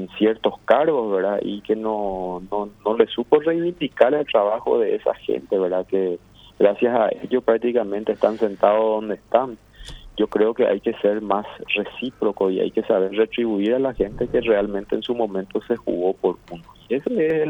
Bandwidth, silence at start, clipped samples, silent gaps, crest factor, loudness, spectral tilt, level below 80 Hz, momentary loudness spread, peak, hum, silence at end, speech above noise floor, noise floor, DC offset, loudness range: 7 kHz; 0 s; under 0.1%; none; 20 dB; -21 LUFS; -7.5 dB/octave; -50 dBFS; 8 LU; 0 dBFS; none; 0 s; 19 dB; -39 dBFS; under 0.1%; 2 LU